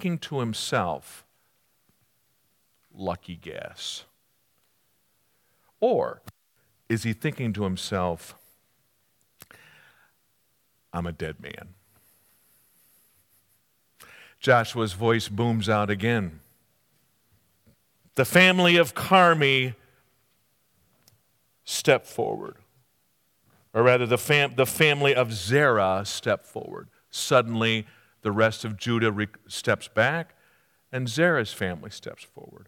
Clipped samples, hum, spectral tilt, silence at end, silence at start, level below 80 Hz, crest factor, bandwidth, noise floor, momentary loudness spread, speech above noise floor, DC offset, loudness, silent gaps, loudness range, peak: under 0.1%; none; -4.5 dB/octave; 0.15 s; 0 s; -66 dBFS; 24 dB; 18 kHz; -70 dBFS; 19 LU; 46 dB; under 0.1%; -24 LUFS; none; 19 LU; -4 dBFS